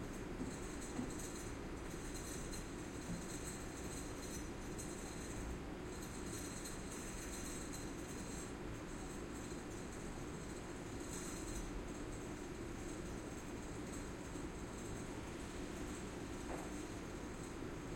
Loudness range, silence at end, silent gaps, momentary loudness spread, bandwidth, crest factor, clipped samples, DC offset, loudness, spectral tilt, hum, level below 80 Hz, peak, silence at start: 1 LU; 0 s; none; 2 LU; 16.5 kHz; 16 dB; under 0.1%; under 0.1%; -47 LUFS; -4.5 dB/octave; none; -54 dBFS; -30 dBFS; 0 s